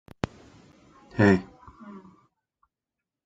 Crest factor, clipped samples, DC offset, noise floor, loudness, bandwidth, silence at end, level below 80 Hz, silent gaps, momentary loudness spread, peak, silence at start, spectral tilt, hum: 24 dB; under 0.1%; under 0.1%; -88 dBFS; -25 LUFS; 7.8 kHz; 1.25 s; -58 dBFS; none; 27 LU; -6 dBFS; 1.15 s; -7.5 dB/octave; none